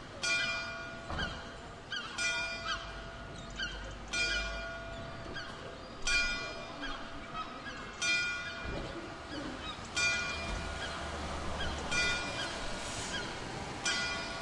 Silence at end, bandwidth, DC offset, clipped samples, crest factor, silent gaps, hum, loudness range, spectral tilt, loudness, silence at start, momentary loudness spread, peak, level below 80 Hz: 0 s; 11.5 kHz; under 0.1%; under 0.1%; 18 dB; none; none; 3 LU; -2 dB/octave; -36 LUFS; 0 s; 13 LU; -20 dBFS; -48 dBFS